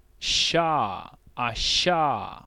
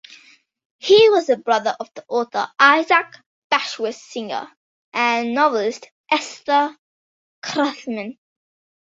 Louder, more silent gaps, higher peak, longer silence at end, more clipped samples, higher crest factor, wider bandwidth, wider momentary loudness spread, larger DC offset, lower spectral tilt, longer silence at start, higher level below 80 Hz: second, -23 LUFS vs -19 LUFS; second, none vs 3.26-3.50 s, 4.57-4.92 s, 5.91-6.04 s, 6.78-7.42 s; second, -10 dBFS vs -2 dBFS; second, 0.05 s vs 0.7 s; neither; about the same, 16 dB vs 20 dB; first, 13 kHz vs 7.8 kHz; second, 10 LU vs 16 LU; neither; about the same, -2.5 dB/octave vs -3 dB/octave; second, 0.2 s vs 0.85 s; first, -44 dBFS vs -70 dBFS